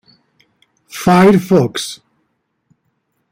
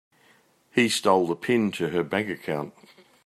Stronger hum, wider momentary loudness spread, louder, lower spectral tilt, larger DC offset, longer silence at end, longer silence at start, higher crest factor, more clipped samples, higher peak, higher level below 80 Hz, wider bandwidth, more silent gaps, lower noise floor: neither; first, 21 LU vs 10 LU; first, -13 LUFS vs -25 LUFS; first, -6 dB/octave vs -4.5 dB/octave; neither; first, 1.35 s vs 0.55 s; first, 0.95 s vs 0.75 s; about the same, 16 dB vs 20 dB; neither; first, -2 dBFS vs -6 dBFS; first, -50 dBFS vs -70 dBFS; first, 16.5 kHz vs 14.5 kHz; neither; first, -67 dBFS vs -61 dBFS